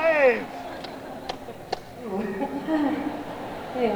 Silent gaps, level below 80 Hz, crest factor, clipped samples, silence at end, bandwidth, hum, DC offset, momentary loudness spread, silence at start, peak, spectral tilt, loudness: none; -56 dBFS; 20 dB; under 0.1%; 0 s; over 20 kHz; none; under 0.1%; 15 LU; 0 s; -8 dBFS; -5.5 dB/octave; -28 LUFS